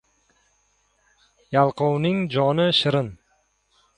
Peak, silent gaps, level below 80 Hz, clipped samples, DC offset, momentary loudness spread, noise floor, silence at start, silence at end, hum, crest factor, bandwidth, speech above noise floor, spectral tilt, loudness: -4 dBFS; none; -60 dBFS; under 0.1%; under 0.1%; 7 LU; -66 dBFS; 1.5 s; 0.85 s; none; 20 dB; 10.5 kHz; 46 dB; -6.5 dB/octave; -21 LUFS